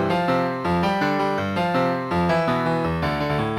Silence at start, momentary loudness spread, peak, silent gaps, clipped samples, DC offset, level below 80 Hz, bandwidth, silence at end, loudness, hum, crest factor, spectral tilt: 0 s; 3 LU; -8 dBFS; none; under 0.1%; under 0.1%; -44 dBFS; 14.5 kHz; 0 s; -22 LUFS; none; 14 dB; -7 dB/octave